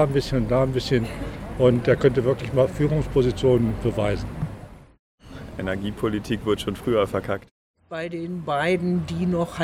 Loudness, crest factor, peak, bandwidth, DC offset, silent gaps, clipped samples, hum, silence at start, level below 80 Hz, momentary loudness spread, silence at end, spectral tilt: -23 LUFS; 20 dB; -4 dBFS; 15.5 kHz; under 0.1%; 4.99-5.18 s, 7.51-7.74 s; under 0.1%; none; 0 s; -40 dBFS; 13 LU; 0 s; -7 dB/octave